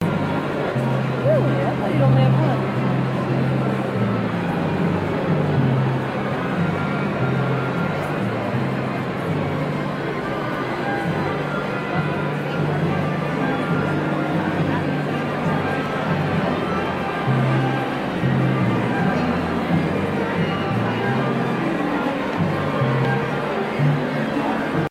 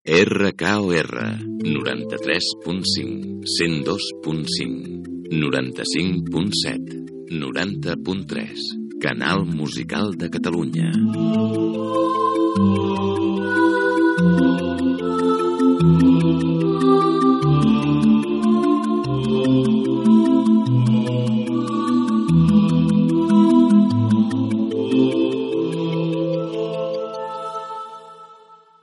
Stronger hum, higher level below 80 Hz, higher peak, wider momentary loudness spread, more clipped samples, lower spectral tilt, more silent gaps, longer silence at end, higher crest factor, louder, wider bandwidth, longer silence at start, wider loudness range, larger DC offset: neither; about the same, -48 dBFS vs -50 dBFS; second, -6 dBFS vs 0 dBFS; second, 4 LU vs 11 LU; neither; first, -8 dB/octave vs -6.5 dB/octave; neither; second, 0 s vs 0.3 s; about the same, 14 dB vs 18 dB; about the same, -21 LUFS vs -19 LUFS; about the same, 12.5 kHz vs 11.5 kHz; about the same, 0 s vs 0.05 s; second, 4 LU vs 7 LU; neither